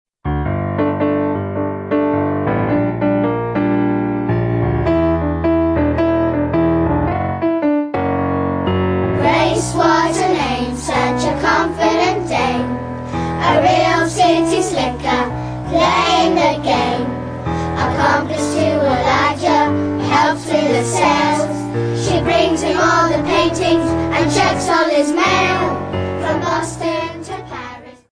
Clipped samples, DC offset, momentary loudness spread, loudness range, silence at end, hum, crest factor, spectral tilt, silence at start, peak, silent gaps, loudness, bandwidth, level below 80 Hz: under 0.1%; under 0.1%; 7 LU; 2 LU; 0.2 s; none; 14 dB; -5.5 dB/octave; 0.25 s; -2 dBFS; none; -16 LUFS; 11 kHz; -36 dBFS